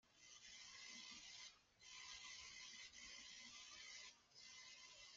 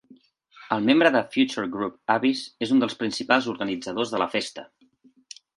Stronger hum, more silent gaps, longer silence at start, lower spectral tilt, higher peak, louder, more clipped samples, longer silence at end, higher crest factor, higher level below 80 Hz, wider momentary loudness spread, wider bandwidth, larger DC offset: neither; neither; second, 0.05 s vs 0.55 s; second, 1 dB/octave vs -4.5 dB/octave; second, -44 dBFS vs -2 dBFS; second, -58 LUFS vs -24 LUFS; neither; second, 0 s vs 0.9 s; second, 16 dB vs 22 dB; second, -86 dBFS vs -68 dBFS; second, 6 LU vs 10 LU; second, 9 kHz vs 11.5 kHz; neither